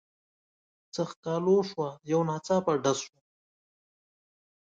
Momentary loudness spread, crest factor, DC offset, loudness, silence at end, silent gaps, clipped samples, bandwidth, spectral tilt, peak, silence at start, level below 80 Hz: 10 LU; 18 dB; under 0.1%; -29 LUFS; 1.6 s; 1.16-1.23 s; under 0.1%; 9 kHz; -5.5 dB/octave; -14 dBFS; 0.95 s; -72 dBFS